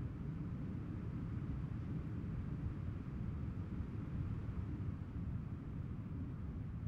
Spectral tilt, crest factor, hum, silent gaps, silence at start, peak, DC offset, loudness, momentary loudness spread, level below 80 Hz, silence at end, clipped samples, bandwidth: -10 dB/octave; 14 dB; none; none; 0 s; -30 dBFS; under 0.1%; -45 LUFS; 2 LU; -52 dBFS; 0 s; under 0.1%; 6.2 kHz